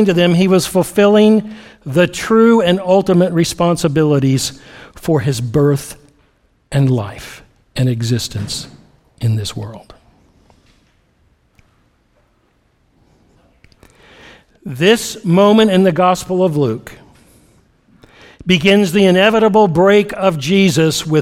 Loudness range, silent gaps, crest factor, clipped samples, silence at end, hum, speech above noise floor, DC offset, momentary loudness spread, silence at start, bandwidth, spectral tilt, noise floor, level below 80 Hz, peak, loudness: 11 LU; none; 14 dB; under 0.1%; 0 s; none; 45 dB; under 0.1%; 16 LU; 0 s; 16 kHz; -5.5 dB/octave; -58 dBFS; -46 dBFS; 0 dBFS; -13 LUFS